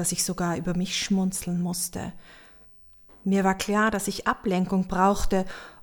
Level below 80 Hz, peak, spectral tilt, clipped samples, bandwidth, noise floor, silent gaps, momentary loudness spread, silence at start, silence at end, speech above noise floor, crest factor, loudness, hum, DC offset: -42 dBFS; -10 dBFS; -4.5 dB/octave; under 0.1%; 19 kHz; -52 dBFS; none; 7 LU; 0 s; 0 s; 26 dB; 16 dB; -26 LUFS; none; under 0.1%